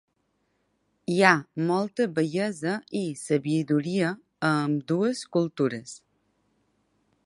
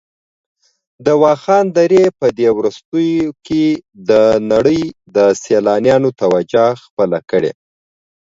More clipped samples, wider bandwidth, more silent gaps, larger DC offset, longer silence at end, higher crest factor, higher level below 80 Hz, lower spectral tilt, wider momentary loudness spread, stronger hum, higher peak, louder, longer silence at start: neither; first, 11.5 kHz vs 7.8 kHz; second, none vs 2.85-2.92 s, 6.90-6.97 s; neither; first, 1.3 s vs 0.8 s; first, 26 dB vs 14 dB; second, -74 dBFS vs -50 dBFS; about the same, -6 dB/octave vs -6 dB/octave; first, 10 LU vs 7 LU; neither; about the same, -2 dBFS vs 0 dBFS; second, -26 LUFS vs -14 LUFS; about the same, 1.1 s vs 1 s